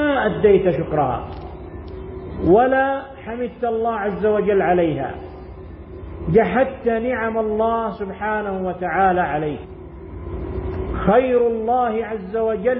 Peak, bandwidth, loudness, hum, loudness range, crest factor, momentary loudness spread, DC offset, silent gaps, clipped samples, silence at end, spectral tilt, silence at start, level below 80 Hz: -4 dBFS; 4.3 kHz; -20 LUFS; none; 3 LU; 16 dB; 19 LU; under 0.1%; none; under 0.1%; 0 s; -12 dB/octave; 0 s; -38 dBFS